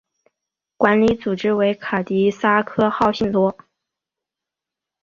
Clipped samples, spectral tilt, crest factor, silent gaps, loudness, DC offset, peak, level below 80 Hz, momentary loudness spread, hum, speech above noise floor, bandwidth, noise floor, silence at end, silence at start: under 0.1%; -7 dB/octave; 18 dB; none; -19 LUFS; under 0.1%; -2 dBFS; -52 dBFS; 5 LU; none; 68 dB; 7.4 kHz; -86 dBFS; 1.5 s; 0.8 s